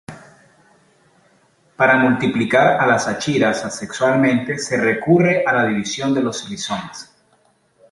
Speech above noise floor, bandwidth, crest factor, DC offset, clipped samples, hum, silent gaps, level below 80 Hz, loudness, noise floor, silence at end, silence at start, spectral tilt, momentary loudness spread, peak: 42 dB; 11.5 kHz; 18 dB; under 0.1%; under 0.1%; none; none; -58 dBFS; -17 LUFS; -59 dBFS; 0.9 s; 0.1 s; -5 dB/octave; 11 LU; -2 dBFS